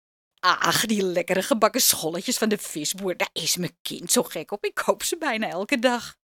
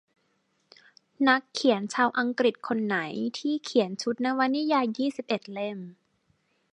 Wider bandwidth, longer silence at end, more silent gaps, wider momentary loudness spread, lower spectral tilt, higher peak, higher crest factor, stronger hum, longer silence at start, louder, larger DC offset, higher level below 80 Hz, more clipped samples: first, 18 kHz vs 10.5 kHz; second, 0.25 s vs 0.8 s; first, 3.80-3.85 s vs none; about the same, 8 LU vs 8 LU; second, -2.5 dB/octave vs -4.5 dB/octave; first, -2 dBFS vs -6 dBFS; about the same, 24 dB vs 22 dB; neither; second, 0.45 s vs 1.2 s; first, -23 LUFS vs -27 LUFS; neither; first, -66 dBFS vs -78 dBFS; neither